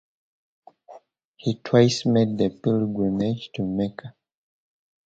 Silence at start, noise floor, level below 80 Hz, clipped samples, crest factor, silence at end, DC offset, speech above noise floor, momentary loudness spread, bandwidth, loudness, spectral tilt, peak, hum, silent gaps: 0.9 s; -51 dBFS; -58 dBFS; under 0.1%; 22 dB; 0.95 s; under 0.1%; 29 dB; 11 LU; 8.8 kHz; -23 LUFS; -6.5 dB/octave; -4 dBFS; none; 1.25-1.34 s